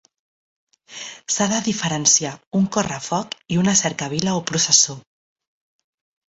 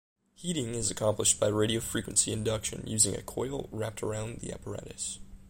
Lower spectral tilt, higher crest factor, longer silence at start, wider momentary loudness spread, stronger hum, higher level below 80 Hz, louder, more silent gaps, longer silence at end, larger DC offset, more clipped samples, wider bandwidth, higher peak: about the same, -3 dB/octave vs -3.5 dB/octave; about the same, 22 dB vs 22 dB; first, 0.9 s vs 0.4 s; first, 16 LU vs 13 LU; neither; second, -58 dBFS vs -52 dBFS; first, -19 LUFS vs -30 LUFS; first, 2.47-2.51 s vs none; first, 1.3 s vs 0 s; neither; neither; second, 8.2 kHz vs 16.5 kHz; first, -2 dBFS vs -10 dBFS